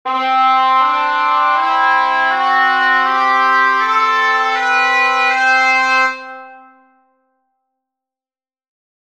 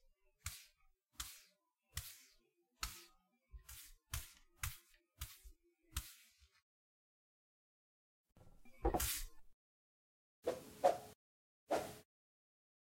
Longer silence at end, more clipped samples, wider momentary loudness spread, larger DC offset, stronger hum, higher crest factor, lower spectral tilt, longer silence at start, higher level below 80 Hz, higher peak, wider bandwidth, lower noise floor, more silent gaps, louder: first, 2.5 s vs 0.9 s; neither; second, 3 LU vs 23 LU; first, 0.2% vs under 0.1%; neither; second, 14 dB vs 28 dB; second, 1 dB/octave vs -3.5 dB/octave; second, 0.05 s vs 0.45 s; second, -72 dBFS vs -58 dBFS; first, -2 dBFS vs -20 dBFS; second, 11.5 kHz vs 16.5 kHz; first, under -90 dBFS vs -78 dBFS; second, none vs 6.62-8.25 s, 9.53-10.43 s, 11.15-11.67 s; first, -12 LUFS vs -45 LUFS